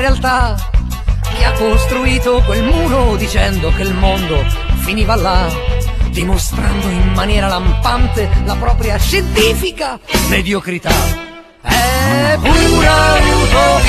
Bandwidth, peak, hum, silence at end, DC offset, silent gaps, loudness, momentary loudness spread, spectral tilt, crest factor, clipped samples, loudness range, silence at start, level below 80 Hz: 14.5 kHz; 0 dBFS; none; 0 s; under 0.1%; none; -13 LUFS; 8 LU; -4.5 dB/octave; 12 dB; under 0.1%; 3 LU; 0 s; -16 dBFS